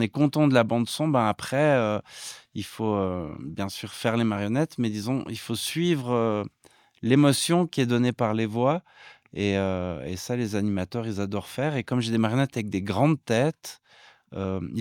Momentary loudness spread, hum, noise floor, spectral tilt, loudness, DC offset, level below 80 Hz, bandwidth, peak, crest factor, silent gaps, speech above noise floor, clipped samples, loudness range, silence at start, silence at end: 12 LU; none; -54 dBFS; -6 dB/octave; -26 LUFS; under 0.1%; -64 dBFS; 17.5 kHz; -6 dBFS; 20 dB; none; 29 dB; under 0.1%; 4 LU; 0 s; 0 s